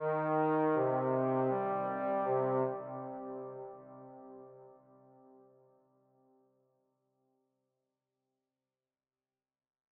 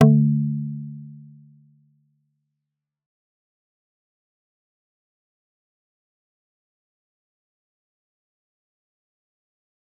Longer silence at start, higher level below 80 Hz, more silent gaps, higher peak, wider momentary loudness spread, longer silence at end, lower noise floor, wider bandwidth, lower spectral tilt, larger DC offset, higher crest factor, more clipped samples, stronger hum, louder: about the same, 0 s vs 0 s; second, -82 dBFS vs -74 dBFS; neither; second, -20 dBFS vs -2 dBFS; second, 22 LU vs 25 LU; second, 5.25 s vs 8.85 s; first, under -90 dBFS vs -84 dBFS; first, 4.1 kHz vs 3 kHz; about the same, -11 dB/octave vs -10 dB/octave; neither; second, 16 dB vs 28 dB; neither; neither; second, -34 LUFS vs -21 LUFS